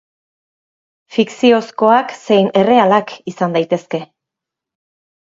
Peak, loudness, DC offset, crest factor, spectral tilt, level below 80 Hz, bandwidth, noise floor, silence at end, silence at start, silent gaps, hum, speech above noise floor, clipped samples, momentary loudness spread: 0 dBFS; -14 LUFS; under 0.1%; 16 dB; -6 dB/octave; -64 dBFS; 7.8 kHz; -83 dBFS; 1.2 s; 1.1 s; none; none; 70 dB; under 0.1%; 11 LU